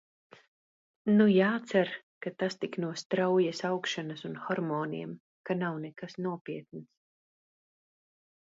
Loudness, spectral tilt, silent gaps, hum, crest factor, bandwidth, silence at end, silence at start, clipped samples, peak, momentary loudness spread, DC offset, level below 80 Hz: -31 LUFS; -6 dB/octave; 2.03-2.21 s, 3.05-3.10 s, 5.20-5.44 s, 6.41-6.45 s; none; 20 dB; 7.8 kHz; 1.7 s; 1.05 s; under 0.1%; -12 dBFS; 17 LU; under 0.1%; -76 dBFS